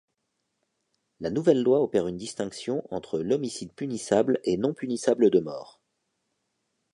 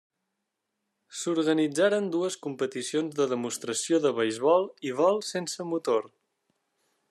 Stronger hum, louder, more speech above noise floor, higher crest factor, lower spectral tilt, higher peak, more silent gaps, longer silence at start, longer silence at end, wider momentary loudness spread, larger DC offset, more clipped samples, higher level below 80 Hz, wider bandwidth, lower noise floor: neither; about the same, -26 LUFS vs -27 LUFS; about the same, 53 dB vs 56 dB; about the same, 20 dB vs 18 dB; first, -6 dB/octave vs -4 dB/octave; first, -8 dBFS vs -12 dBFS; neither; about the same, 1.2 s vs 1.1 s; first, 1.3 s vs 1.05 s; first, 12 LU vs 8 LU; neither; neither; first, -64 dBFS vs -84 dBFS; second, 11 kHz vs 13.5 kHz; about the same, -79 dBFS vs -82 dBFS